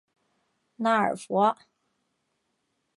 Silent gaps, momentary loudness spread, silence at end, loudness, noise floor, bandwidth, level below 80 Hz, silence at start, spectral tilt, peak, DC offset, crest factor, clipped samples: none; 6 LU; 1.45 s; -25 LUFS; -77 dBFS; 11.5 kHz; -78 dBFS; 0.8 s; -5.5 dB/octave; -10 dBFS; under 0.1%; 20 dB; under 0.1%